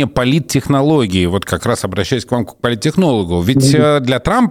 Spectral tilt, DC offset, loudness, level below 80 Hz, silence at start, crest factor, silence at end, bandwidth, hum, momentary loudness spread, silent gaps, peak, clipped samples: -6 dB/octave; 0.1%; -14 LUFS; -36 dBFS; 0 s; 12 dB; 0 s; 16.5 kHz; none; 6 LU; none; -2 dBFS; under 0.1%